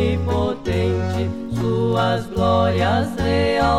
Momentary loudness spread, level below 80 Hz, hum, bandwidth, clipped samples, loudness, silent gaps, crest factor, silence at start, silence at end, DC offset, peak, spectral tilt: 5 LU; -36 dBFS; none; 13 kHz; under 0.1%; -20 LUFS; none; 14 dB; 0 s; 0 s; 0.6%; -4 dBFS; -7 dB/octave